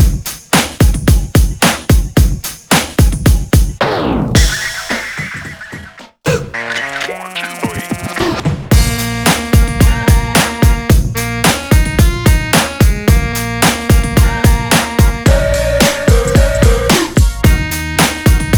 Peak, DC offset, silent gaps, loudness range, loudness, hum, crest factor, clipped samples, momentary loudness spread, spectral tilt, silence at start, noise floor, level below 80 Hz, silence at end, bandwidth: 0 dBFS; under 0.1%; none; 6 LU; -13 LUFS; none; 12 dB; under 0.1%; 9 LU; -4.5 dB/octave; 0 s; -33 dBFS; -16 dBFS; 0 s; over 20 kHz